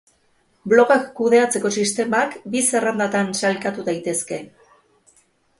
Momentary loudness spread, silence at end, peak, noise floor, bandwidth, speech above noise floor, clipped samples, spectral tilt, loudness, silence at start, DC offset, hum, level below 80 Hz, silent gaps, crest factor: 9 LU; 1.15 s; 0 dBFS; -62 dBFS; 11.5 kHz; 43 dB; under 0.1%; -3.5 dB/octave; -19 LUFS; 0.65 s; under 0.1%; none; -66 dBFS; none; 20 dB